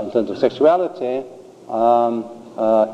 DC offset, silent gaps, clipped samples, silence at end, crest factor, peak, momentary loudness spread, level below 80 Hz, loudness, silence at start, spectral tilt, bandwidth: under 0.1%; none; under 0.1%; 0 s; 16 dB; -2 dBFS; 12 LU; -66 dBFS; -19 LUFS; 0 s; -7 dB/octave; 8.8 kHz